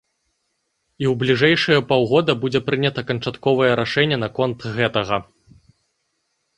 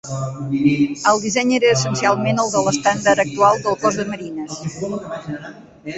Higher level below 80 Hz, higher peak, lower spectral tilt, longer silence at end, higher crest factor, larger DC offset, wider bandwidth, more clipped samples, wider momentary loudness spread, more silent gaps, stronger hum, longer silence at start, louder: about the same, -54 dBFS vs -54 dBFS; about the same, -2 dBFS vs -2 dBFS; first, -6.5 dB/octave vs -4.5 dB/octave; first, 1.35 s vs 0 s; about the same, 18 dB vs 16 dB; neither; first, 10.5 kHz vs 8.2 kHz; neither; second, 8 LU vs 13 LU; neither; neither; first, 1 s vs 0.05 s; about the same, -19 LUFS vs -18 LUFS